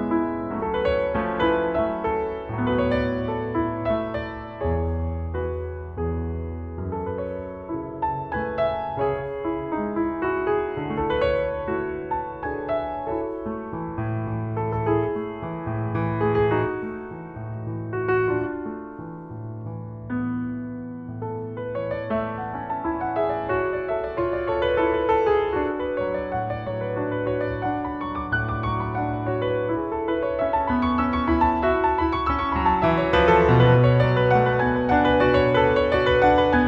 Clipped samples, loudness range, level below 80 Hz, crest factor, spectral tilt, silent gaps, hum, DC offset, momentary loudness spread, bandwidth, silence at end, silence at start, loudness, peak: under 0.1%; 10 LU; -40 dBFS; 18 dB; -9 dB/octave; none; none; under 0.1%; 13 LU; 6.8 kHz; 0 s; 0 s; -24 LUFS; -6 dBFS